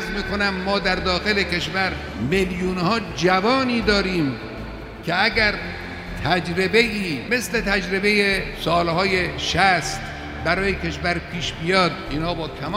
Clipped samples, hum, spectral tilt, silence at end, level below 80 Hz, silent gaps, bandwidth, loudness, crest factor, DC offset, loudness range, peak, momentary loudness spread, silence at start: under 0.1%; none; -4.5 dB/octave; 0 s; -38 dBFS; none; 16 kHz; -21 LUFS; 20 dB; under 0.1%; 2 LU; -2 dBFS; 10 LU; 0 s